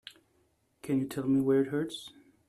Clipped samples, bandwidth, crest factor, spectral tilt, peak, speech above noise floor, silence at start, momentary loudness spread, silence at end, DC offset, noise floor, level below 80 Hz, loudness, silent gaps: under 0.1%; 13.5 kHz; 14 dB; -6.5 dB/octave; -18 dBFS; 42 dB; 0.05 s; 22 LU; 0.4 s; under 0.1%; -72 dBFS; -68 dBFS; -30 LUFS; none